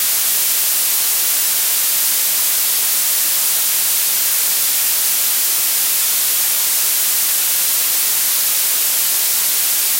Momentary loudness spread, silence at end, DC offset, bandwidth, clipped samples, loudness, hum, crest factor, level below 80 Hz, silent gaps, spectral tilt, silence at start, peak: 0 LU; 0 s; under 0.1%; 16.5 kHz; under 0.1%; -13 LUFS; none; 12 dB; -62 dBFS; none; 3 dB/octave; 0 s; -4 dBFS